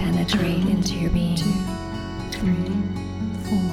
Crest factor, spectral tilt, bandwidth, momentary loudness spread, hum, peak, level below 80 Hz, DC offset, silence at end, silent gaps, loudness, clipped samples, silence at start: 14 dB; -6 dB/octave; 15 kHz; 9 LU; none; -8 dBFS; -36 dBFS; under 0.1%; 0 s; none; -24 LUFS; under 0.1%; 0 s